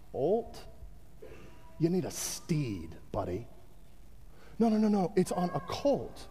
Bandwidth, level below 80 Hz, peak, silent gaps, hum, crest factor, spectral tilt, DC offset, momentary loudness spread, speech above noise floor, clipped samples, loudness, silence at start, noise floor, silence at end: 15.5 kHz; -54 dBFS; -16 dBFS; none; none; 16 dB; -6 dB/octave; 0.4%; 24 LU; 25 dB; under 0.1%; -32 LUFS; 0.1 s; -56 dBFS; 0 s